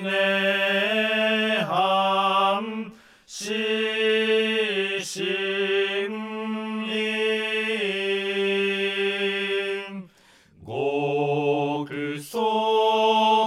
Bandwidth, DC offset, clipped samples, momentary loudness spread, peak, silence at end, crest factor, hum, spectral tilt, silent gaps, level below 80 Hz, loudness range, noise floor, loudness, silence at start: 14.5 kHz; under 0.1%; under 0.1%; 9 LU; -10 dBFS; 0 s; 14 dB; none; -4 dB/octave; none; -72 dBFS; 3 LU; -56 dBFS; -23 LUFS; 0 s